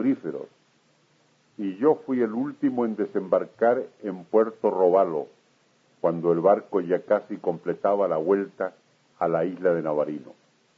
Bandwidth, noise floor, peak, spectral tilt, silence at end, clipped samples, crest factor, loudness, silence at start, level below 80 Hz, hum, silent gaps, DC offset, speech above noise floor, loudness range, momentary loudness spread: 7 kHz; -64 dBFS; -8 dBFS; -9 dB/octave; 0.45 s; under 0.1%; 18 dB; -25 LUFS; 0 s; -76 dBFS; none; none; under 0.1%; 40 dB; 2 LU; 12 LU